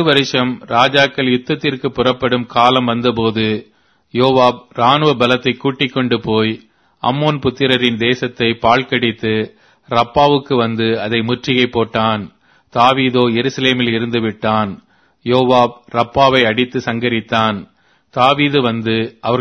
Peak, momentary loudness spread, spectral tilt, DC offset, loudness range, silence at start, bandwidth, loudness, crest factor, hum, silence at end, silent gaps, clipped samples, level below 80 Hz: 0 dBFS; 7 LU; -6 dB/octave; under 0.1%; 1 LU; 0 s; 11 kHz; -15 LUFS; 14 dB; none; 0 s; none; under 0.1%; -48 dBFS